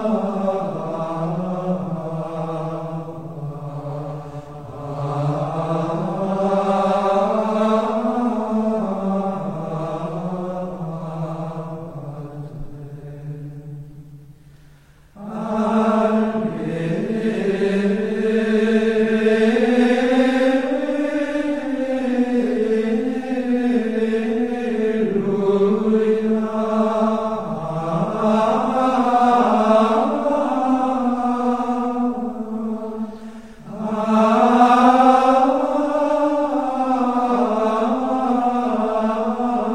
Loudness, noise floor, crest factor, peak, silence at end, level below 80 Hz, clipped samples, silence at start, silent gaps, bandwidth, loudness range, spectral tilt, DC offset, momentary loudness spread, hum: -19 LUFS; -49 dBFS; 18 dB; -2 dBFS; 0 s; -50 dBFS; under 0.1%; 0 s; none; 10.5 kHz; 12 LU; -7.5 dB/octave; 0.8%; 15 LU; none